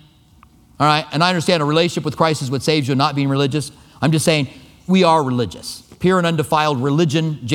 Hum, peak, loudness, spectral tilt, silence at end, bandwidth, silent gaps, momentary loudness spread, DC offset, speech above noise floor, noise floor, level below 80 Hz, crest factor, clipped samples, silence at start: none; 0 dBFS; -17 LUFS; -5.5 dB/octave; 0 s; 16.5 kHz; none; 8 LU; under 0.1%; 33 dB; -49 dBFS; -52 dBFS; 18 dB; under 0.1%; 0.8 s